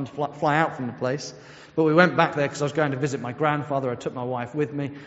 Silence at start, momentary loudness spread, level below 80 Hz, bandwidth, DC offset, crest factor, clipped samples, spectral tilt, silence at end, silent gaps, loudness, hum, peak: 0 s; 12 LU; -64 dBFS; 8 kHz; under 0.1%; 24 dB; under 0.1%; -5 dB/octave; 0 s; none; -24 LUFS; none; 0 dBFS